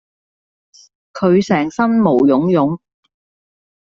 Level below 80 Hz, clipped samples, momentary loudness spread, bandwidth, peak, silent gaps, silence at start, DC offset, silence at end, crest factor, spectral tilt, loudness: -56 dBFS; under 0.1%; 8 LU; 7.6 kHz; -2 dBFS; none; 1.15 s; under 0.1%; 1.1 s; 14 dB; -7.5 dB/octave; -14 LUFS